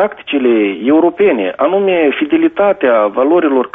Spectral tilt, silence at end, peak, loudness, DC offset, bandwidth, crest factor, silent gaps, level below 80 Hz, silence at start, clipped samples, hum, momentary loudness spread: -3.5 dB/octave; 0.05 s; -2 dBFS; -12 LUFS; under 0.1%; 3.8 kHz; 10 dB; none; -56 dBFS; 0 s; under 0.1%; none; 3 LU